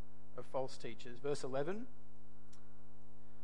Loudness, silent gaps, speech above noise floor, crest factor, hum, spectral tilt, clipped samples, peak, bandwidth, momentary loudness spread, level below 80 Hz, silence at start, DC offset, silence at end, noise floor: -44 LUFS; none; 21 dB; 20 dB; none; -5.5 dB/octave; under 0.1%; -26 dBFS; 11.5 kHz; 24 LU; -72 dBFS; 0 s; 2%; 0 s; -63 dBFS